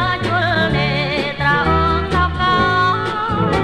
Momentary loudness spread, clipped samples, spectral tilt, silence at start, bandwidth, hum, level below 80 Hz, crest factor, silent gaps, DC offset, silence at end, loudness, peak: 4 LU; under 0.1%; -6.5 dB/octave; 0 s; 12 kHz; none; -30 dBFS; 14 dB; none; under 0.1%; 0 s; -16 LUFS; -4 dBFS